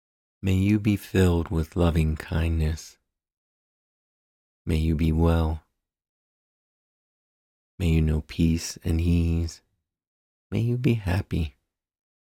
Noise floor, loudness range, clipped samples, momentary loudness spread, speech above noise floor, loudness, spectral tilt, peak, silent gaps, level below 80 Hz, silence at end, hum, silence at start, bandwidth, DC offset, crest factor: under -90 dBFS; 4 LU; under 0.1%; 8 LU; over 67 dB; -25 LUFS; -7 dB/octave; -10 dBFS; 3.37-4.65 s, 6.09-7.78 s, 10.07-10.50 s; -34 dBFS; 0.9 s; none; 0.45 s; 15.5 kHz; under 0.1%; 16 dB